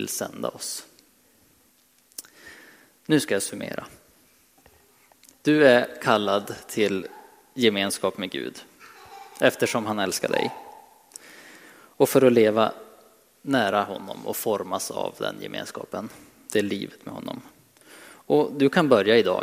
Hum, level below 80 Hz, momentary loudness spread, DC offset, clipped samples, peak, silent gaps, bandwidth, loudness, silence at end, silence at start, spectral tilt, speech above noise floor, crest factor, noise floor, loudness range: none; -70 dBFS; 24 LU; under 0.1%; under 0.1%; -4 dBFS; none; 16 kHz; -24 LUFS; 0 s; 0 s; -4 dB/octave; 38 dB; 22 dB; -61 dBFS; 7 LU